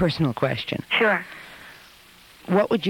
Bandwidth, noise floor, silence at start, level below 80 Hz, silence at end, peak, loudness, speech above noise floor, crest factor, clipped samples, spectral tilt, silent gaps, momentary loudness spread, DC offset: 17.5 kHz; -50 dBFS; 0 s; -56 dBFS; 0 s; -6 dBFS; -23 LUFS; 28 dB; 18 dB; under 0.1%; -6.5 dB/octave; none; 23 LU; under 0.1%